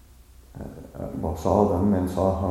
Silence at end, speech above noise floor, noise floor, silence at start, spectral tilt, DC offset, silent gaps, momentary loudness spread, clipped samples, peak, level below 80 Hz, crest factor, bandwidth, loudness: 0 s; 27 dB; -50 dBFS; 0.55 s; -8.5 dB/octave; under 0.1%; none; 19 LU; under 0.1%; -6 dBFS; -42 dBFS; 20 dB; 15 kHz; -24 LUFS